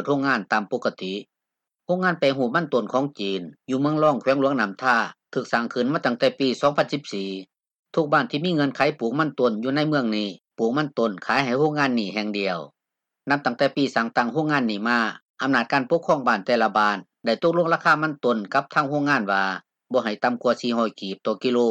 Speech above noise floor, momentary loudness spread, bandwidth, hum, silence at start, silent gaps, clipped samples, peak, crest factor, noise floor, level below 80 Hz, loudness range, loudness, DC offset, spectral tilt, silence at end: 63 dB; 8 LU; 9 kHz; none; 0 s; 7.79-7.83 s, 15.22-15.34 s; under 0.1%; -6 dBFS; 18 dB; -85 dBFS; -72 dBFS; 3 LU; -23 LUFS; under 0.1%; -6 dB/octave; 0 s